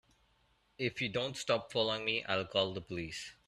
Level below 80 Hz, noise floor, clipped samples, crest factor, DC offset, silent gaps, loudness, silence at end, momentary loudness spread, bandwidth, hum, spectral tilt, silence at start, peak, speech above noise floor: -66 dBFS; -72 dBFS; under 0.1%; 22 dB; under 0.1%; none; -35 LUFS; 0.15 s; 9 LU; 13 kHz; none; -4 dB/octave; 0.8 s; -16 dBFS; 36 dB